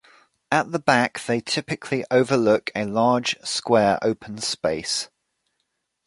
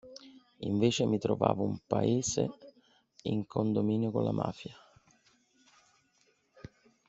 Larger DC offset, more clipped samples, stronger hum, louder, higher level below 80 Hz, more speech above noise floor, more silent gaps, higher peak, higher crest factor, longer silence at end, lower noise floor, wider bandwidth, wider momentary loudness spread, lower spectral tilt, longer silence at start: neither; neither; neither; first, -22 LUFS vs -31 LUFS; first, -60 dBFS vs -66 dBFS; first, 54 dB vs 41 dB; neither; first, -2 dBFS vs -10 dBFS; about the same, 22 dB vs 24 dB; second, 1 s vs 2.35 s; first, -76 dBFS vs -71 dBFS; first, 11.5 kHz vs 8 kHz; second, 8 LU vs 21 LU; second, -4 dB/octave vs -6.5 dB/octave; first, 0.5 s vs 0.05 s